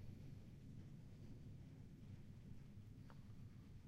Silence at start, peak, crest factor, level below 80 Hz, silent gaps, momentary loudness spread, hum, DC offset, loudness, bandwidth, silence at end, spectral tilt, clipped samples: 0 s; -44 dBFS; 14 dB; -66 dBFS; none; 2 LU; none; under 0.1%; -60 LUFS; 14 kHz; 0 s; -7.5 dB/octave; under 0.1%